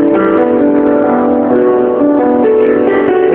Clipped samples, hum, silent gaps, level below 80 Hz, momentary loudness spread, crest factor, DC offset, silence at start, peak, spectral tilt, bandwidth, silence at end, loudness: under 0.1%; none; none; -44 dBFS; 1 LU; 8 dB; under 0.1%; 0 s; 0 dBFS; -10.5 dB/octave; 3.9 kHz; 0 s; -10 LUFS